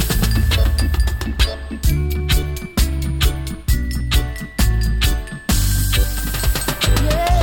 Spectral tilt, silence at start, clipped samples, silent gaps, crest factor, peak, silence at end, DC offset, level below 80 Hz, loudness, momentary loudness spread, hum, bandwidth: -4.5 dB/octave; 0 s; under 0.1%; none; 14 dB; -2 dBFS; 0 s; under 0.1%; -18 dBFS; -19 LUFS; 4 LU; none; 17.5 kHz